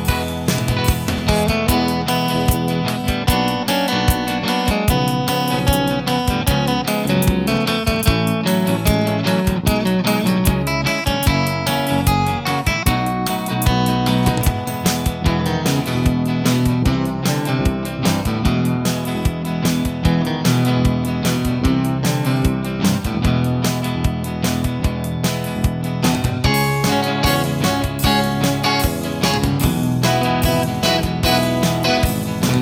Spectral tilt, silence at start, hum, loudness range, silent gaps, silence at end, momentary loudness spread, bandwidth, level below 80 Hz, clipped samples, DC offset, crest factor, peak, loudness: -5 dB/octave; 0 s; none; 2 LU; none; 0 s; 4 LU; 18 kHz; -28 dBFS; under 0.1%; under 0.1%; 14 dB; -4 dBFS; -18 LUFS